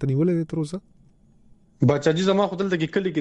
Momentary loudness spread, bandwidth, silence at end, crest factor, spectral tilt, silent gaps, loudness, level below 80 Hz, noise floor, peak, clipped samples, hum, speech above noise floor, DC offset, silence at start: 9 LU; 10.5 kHz; 0 s; 16 dB; -7 dB/octave; none; -23 LUFS; -56 dBFS; -55 dBFS; -8 dBFS; under 0.1%; none; 33 dB; under 0.1%; 0 s